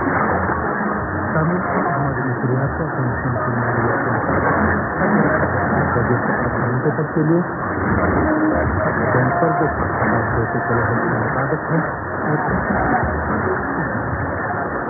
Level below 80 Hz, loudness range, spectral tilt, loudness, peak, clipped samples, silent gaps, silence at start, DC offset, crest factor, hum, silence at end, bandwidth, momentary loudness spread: -36 dBFS; 2 LU; -16.5 dB/octave; -19 LUFS; -4 dBFS; under 0.1%; none; 0 s; under 0.1%; 16 dB; none; 0 s; 2.5 kHz; 4 LU